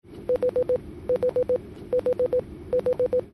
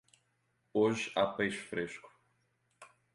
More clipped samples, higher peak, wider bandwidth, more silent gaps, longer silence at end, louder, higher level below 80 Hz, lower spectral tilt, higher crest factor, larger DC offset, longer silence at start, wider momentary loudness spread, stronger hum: neither; about the same, -16 dBFS vs -16 dBFS; about the same, 11.5 kHz vs 11.5 kHz; neither; second, 0.05 s vs 0.3 s; first, -26 LUFS vs -34 LUFS; first, -50 dBFS vs -72 dBFS; first, -8 dB/octave vs -5 dB/octave; second, 10 dB vs 20 dB; neither; second, 0.1 s vs 0.75 s; second, 5 LU vs 10 LU; neither